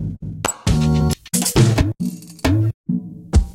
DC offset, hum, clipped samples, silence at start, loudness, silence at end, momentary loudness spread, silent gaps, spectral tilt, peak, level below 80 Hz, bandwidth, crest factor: under 0.1%; none; under 0.1%; 0 s; -19 LUFS; 0.05 s; 11 LU; 2.74-2.84 s; -5.5 dB/octave; -2 dBFS; -26 dBFS; 16.5 kHz; 16 dB